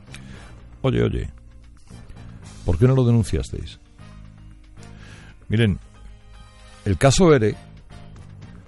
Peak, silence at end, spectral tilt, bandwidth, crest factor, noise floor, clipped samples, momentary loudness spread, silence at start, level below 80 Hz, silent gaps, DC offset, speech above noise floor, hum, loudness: -4 dBFS; 0.2 s; -6.5 dB/octave; 11.5 kHz; 20 dB; -44 dBFS; under 0.1%; 27 LU; 0.1 s; -36 dBFS; none; under 0.1%; 26 dB; none; -20 LUFS